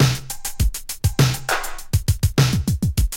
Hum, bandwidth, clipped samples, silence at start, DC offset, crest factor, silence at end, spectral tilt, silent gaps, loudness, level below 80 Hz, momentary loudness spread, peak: none; 17 kHz; under 0.1%; 0 s; under 0.1%; 16 dB; 0 s; -4.5 dB/octave; none; -21 LUFS; -28 dBFS; 6 LU; -4 dBFS